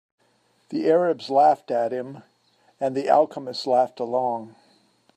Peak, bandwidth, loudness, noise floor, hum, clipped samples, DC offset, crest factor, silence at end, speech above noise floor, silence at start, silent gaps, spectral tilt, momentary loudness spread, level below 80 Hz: -4 dBFS; 9.2 kHz; -23 LUFS; -65 dBFS; none; under 0.1%; under 0.1%; 20 dB; 0.65 s; 43 dB; 0.7 s; none; -6 dB/octave; 12 LU; -80 dBFS